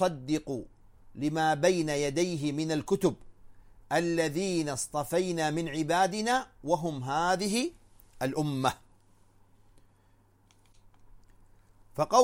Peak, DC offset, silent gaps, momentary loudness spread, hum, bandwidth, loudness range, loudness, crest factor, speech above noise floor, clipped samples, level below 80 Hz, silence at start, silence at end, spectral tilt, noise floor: -10 dBFS; under 0.1%; none; 7 LU; none; 16.5 kHz; 8 LU; -30 LUFS; 22 dB; 35 dB; under 0.1%; -58 dBFS; 0 s; 0 s; -4.5 dB/octave; -63 dBFS